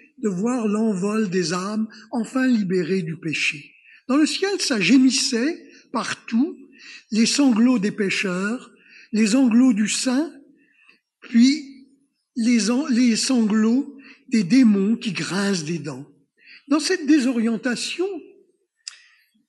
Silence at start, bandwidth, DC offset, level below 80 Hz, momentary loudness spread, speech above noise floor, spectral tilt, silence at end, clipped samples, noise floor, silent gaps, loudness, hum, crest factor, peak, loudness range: 0.2 s; 12 kHz; under 0.1%; -76 dBFS; 13 LU; 41 dB; -4 dB/octave; 1.25 s; under 0.1%; -61 dBFS; none; -21 LUFS; none; 16 dB; -6 dBFS; 3 LU